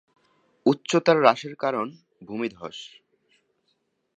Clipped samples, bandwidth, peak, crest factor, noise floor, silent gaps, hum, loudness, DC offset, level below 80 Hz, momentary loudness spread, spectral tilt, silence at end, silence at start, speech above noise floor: under 0.1%; 9.2 kHz; -2 dBFS; 24 dB; -73 dBFS; none; none; -23 LUFS; under 0.1%; -74 dBFS; 19 LU; -5 dB/octave; 1.3 s; 0.65 s; 49 dB